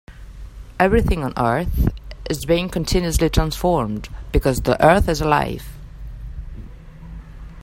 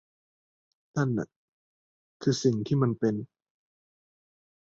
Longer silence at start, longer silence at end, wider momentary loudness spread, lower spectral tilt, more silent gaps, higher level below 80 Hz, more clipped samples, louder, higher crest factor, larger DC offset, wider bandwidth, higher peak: second, 0.1 s vs 0.95 s; second, 0 s vs 1.4 s; first, 23 LU vs 11 LU; about the same, -5.5 dB/octave vs -6.5 dB/octave; second, none vs 1.36-2.20 s; first, -28 dBFS vs -66 dBFS; neither; first, -19 LUFS vs -29 LUFS; about the same, 20 dB vs 20 dB; neither; first, 16.5 kHz vs 7.8 kHz; first, 0 dBFS vs -12 dBFS